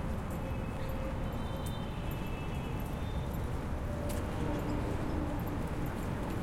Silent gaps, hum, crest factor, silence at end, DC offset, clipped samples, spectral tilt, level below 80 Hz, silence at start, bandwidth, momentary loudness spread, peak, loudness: none; none; 14 dB; 0 s; under 0.1%; under 0.1%; -7 dB/octave; -40 dBFS; 0 s; 16.5 kHz; 3 LU; -22 dBFS; -37 LUFS